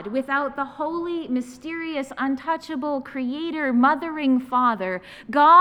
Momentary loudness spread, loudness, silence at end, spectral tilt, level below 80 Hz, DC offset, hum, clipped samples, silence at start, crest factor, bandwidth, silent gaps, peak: 10 LU; -24 LUFS; 0 s; -5.5 dB/octave; -62 dBFS; under 0.1%; none; under 0.1%; 0 s; 18 dB; 11 kHz; none; -4 dBFS